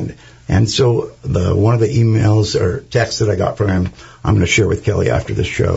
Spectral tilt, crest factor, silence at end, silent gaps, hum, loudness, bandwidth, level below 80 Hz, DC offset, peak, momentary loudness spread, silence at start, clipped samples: -6 dB/octave; 14 dB; 0 s; none; none; -16 LUFS; 8 kHz; -36 dBFS; under 0.1%; 0 dBFS; 7 LU; 0 s; under 0.1%